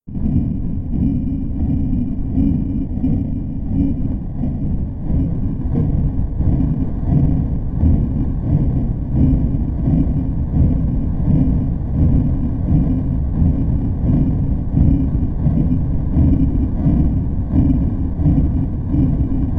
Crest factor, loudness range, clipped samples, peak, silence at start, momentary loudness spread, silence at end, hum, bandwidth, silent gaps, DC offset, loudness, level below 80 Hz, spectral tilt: 16 dB; 3 LU; under 0.1%; 0 dBFS; 0.05 s; 6 LU; 0 s; none; 3.1 kHz; none; under 0.1%; -18 LUFS; -20 dBFS; -13 dB/octave